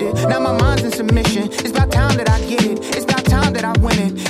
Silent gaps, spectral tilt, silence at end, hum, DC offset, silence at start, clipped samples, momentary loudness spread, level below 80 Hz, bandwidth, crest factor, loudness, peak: none; -5.5 dB/octave; 0 s; none; under 0.1%; 0 s; under 0.1%; 3 LU; -24 dBFS; 15.5 kHz; 12 dB; -16 LUFS; -4 dBFS